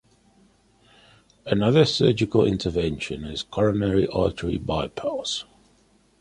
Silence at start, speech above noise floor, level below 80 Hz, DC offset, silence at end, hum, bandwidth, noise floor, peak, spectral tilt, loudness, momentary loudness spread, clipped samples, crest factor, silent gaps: 1.45 s; 38 dB; -44 dBFS; under 0.1%; 0.75 s; none; 11 kHz; -60 dBFS; -4 dBFS; -6 dB/octave; -23 LUFS; 11 LU; under 0.1%; 20 dB; none